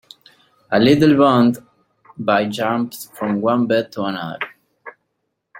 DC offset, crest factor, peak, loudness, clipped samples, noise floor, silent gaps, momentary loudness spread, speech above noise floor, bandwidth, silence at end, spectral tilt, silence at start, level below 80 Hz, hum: under 0.1%; 18 dB; -2 dBFS; -17 LUFS; under 0.1%; -74 dBFS; none; 15 LU; 57 dB; 16.5 kHz; 0 s; -6.5 dB/octave; 0.7 s; -56 dBFS; none